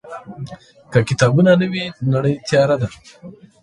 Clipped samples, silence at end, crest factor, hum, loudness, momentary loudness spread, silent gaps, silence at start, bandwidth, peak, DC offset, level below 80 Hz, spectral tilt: under 0.1%; 0.3 s; 18 dB; none; -17 LUFS; 20 LU; none; 0.05 s; 11.5 kHz; 0 dBFS; under 0.1%; -50 dBFS; -6.5 dB/octave